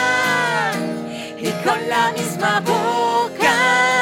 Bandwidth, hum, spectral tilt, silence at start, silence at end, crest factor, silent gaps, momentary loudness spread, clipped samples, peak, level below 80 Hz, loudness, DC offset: 17 kHz; none; -3.5 dB/octave; 0 s; 0 s; 14 dB; none; 11 LU; under 0.1%; -4 dBFS; -64 dBFS; -18 LUFS; under 0.1%